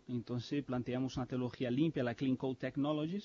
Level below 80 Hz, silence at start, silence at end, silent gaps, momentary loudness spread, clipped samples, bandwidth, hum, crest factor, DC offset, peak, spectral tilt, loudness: -66 dBFS; 0.1 s; 0 s; none; 5 LU; under 0.1%; 7.2 kHz; none; 16 dB; under 0.1%; -22 dBFS; -6.5 dB/octave; -37 LUFS